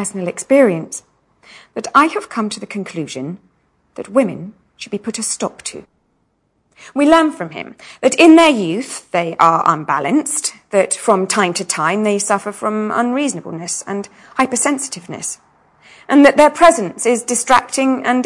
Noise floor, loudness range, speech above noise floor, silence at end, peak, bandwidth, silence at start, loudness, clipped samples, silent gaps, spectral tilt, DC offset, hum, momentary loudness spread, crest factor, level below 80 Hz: -64 dBFS; 9 LU; 48 dB; 0 s; 0 dBFS; 12 kHz; 0 s; -15 LUFS; 0.3%; none; -3.5 dB/octave; under 0.1%; none; 17 LU; 16 dB; -54 dBFS